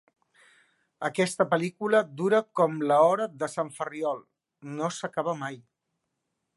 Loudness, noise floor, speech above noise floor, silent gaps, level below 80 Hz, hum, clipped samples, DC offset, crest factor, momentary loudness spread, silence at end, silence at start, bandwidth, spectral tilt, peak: -27 LUFS; -81 dBFS; 55 dB; none; -78 dBFS; none; under 0.1%; under 0.1%; 20 dB; 13 LU; 0.95 s; 1 s; 11.5 kHz; -5 dB/octave; -8 dBFS